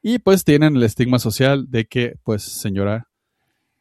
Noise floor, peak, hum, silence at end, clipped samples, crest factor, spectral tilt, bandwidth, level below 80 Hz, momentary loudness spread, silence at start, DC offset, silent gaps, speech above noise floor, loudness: -72 dBFS; -2 dBFS; none; 0.8 s; under 0.1%; 16 dB; -6 dB/octave; 14 kHz; -50 dBFS; 10 LU; 0.05 s; under 0.1%; none; 55 dB; -18 LUFS